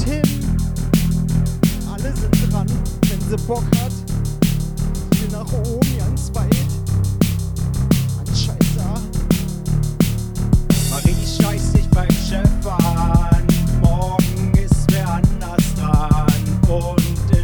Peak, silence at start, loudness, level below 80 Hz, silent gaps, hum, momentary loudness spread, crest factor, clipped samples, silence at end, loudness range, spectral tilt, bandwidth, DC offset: 0 dBFS; 0 s; -18 LUFS; -22 dBFS; none; none; 6 LU; 16 dB; under 0.1%; 0 s; 3 LU; -6.5 dB/octave; over 20 kHz; under 0.1%